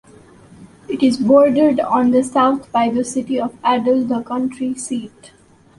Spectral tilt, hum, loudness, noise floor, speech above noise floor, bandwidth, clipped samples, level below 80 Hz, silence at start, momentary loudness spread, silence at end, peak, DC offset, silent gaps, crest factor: -5 dB/octave; none; -17 LUFS; -44 dBFS; 28 dB; 11.5 kHz; under 0.1%; -56 dBFS; 0.6 s; 12 LU; 0.5 s; -2 dBFS; under 0.1%; none; 16 dB